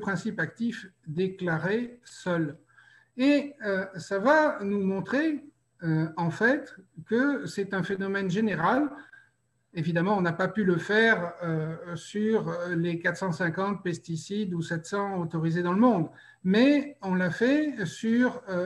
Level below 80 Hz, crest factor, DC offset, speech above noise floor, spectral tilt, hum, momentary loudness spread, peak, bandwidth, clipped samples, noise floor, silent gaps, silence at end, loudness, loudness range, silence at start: -68 dBFS; 18 dB; under 0.1%; 42 dB; -6.5 dB/octave; none; 11 LU; -10 dBFS; 11.5 kHz; under 0.1%; -69 dBFS; none; 0 s; -27 LUFS; 4 LU; 0 s